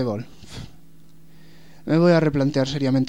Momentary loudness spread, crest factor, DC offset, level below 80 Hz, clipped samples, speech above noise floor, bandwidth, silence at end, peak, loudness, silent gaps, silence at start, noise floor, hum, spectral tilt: 22 LU; 16 dB; 0.8%; -52 dBFS; under 0.1%; 32 dB; 10 kHz; 0 s; -6 dBFS; -20 LUFS; none; 0 s; -52 dBFS; none; -7.5 dB/octave